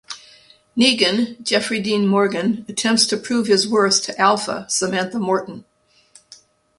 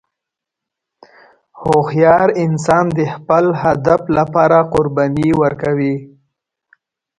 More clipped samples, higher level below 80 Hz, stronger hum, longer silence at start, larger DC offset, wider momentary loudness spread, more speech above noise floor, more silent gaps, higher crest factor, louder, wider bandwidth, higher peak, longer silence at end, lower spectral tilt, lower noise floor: neither; second, -62 dBFS vs -46 dBFS; neither; second, 0.1 s vs 1.55 s; neither; about the same, 7 LU vs 6 LU; second, 34 dB vs 69 dB; neither; about the same, 20 dB vs 16 dB; second, -18 LUFS vs -14 LUFS; about the same, 11.5 kHz vs 11.5 kHz; about the same, 0 dBFS vs 0 dBFS; about the same, 1.15 s vs 1.1 s; second, -3 dB/octave vs -7.5 dB/octave; second, -53 dBFS vs -82 dBFS